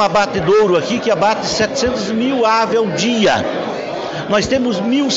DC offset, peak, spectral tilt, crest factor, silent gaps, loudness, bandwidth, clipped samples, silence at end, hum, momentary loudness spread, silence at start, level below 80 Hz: under 0.1%; -2 dBFS; -4 dB/octave; 14 dB; none; -15 LUFS; 8 kHz; under 0.1%; 0 s; none; 8 LU; 0 s; -46 dBFS